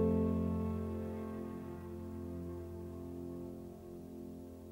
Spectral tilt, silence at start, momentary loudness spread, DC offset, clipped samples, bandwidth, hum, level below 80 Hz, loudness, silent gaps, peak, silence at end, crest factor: -9.5 dB/octave; 0 s; 14 LU; under 0.1%; under 0.1%; 16 kHz; none; -56 dBFS; -42 LUFS; none; -22 dBFS; 0 s; 18 dB